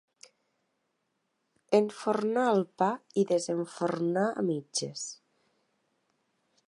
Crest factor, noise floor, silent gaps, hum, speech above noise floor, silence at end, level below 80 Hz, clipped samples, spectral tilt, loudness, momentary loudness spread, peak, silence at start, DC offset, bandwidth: 22 dB; -79 dBFS; none; none; 50 dB; 1.55 s; -84 dBFS; under 0.1%; -5 dB/octave; -29 LUFS; 7 LU; -10 dBFS; 1.7 s; under 0.1%; 11.5 kHz